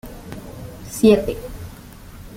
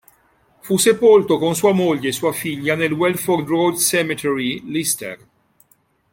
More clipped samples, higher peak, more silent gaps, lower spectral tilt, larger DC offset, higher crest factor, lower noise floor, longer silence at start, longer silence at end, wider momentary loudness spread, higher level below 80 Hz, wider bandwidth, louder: neither; about the same, -2 dBFS vs -2 dBFS; neither; first, -6 dB/octave vs -4 dB/octave; neither; about the same, 20 dB vs 16 dB; second, -39 dBFS vs -60 dBFS; second, 0.05 s vs 0.65 s; second, 0 s vs 1 s; first, 26 LU vs 9 LU; first, -40 dBFS vs -58 dBFS; about the same, 17 kHz vs 17 kHz; about the same, -18 LUFS vs -18 LUFS